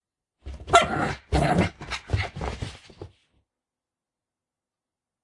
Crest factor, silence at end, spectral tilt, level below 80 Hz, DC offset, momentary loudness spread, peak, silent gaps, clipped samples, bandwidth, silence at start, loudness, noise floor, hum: 28 dB; 2.15 s; -5 dB/octave; -40 dBFS; under 0.1%; 23 LU; 0 dBFS; none; under 0.1%; 11.5 kHz; 0.45 s; -25 LUFS; -89 dBFS; none